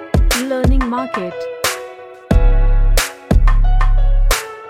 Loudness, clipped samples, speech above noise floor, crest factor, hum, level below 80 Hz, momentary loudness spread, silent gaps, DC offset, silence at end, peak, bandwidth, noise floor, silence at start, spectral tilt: -17 LUFS; under 0.1%; 17 dB; 12 dB; none; -14 dBFS; 7 LU; none; under 0.1%; 0 s; 0 dBFS; 16 kHz; -33 dBFS; 0 s; -5 dB/octave